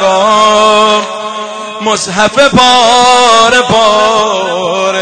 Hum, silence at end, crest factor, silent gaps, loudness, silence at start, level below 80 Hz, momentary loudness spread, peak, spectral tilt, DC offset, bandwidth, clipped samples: none; 0 s; 8 dB; none; -7 LUFS; 0 s; -42 dBFS; 12 LU; 0 dBFS; -2.5 dB/octave; under 0.1%; 11 kHz; 1%